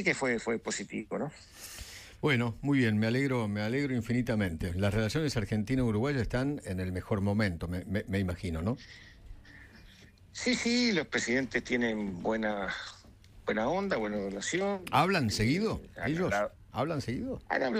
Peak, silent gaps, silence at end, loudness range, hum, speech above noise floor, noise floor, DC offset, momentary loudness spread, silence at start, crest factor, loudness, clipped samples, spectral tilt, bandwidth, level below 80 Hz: -12 dBFS; none; 0 s; 3 LU; none; 25 dB; -56 dBFS; under 0.1%; 9 LU; 0 s; 18 dB; -31 LUFS; under 0.1%; -5.5 dB/octave; 15.5 kHz; -52 dBFS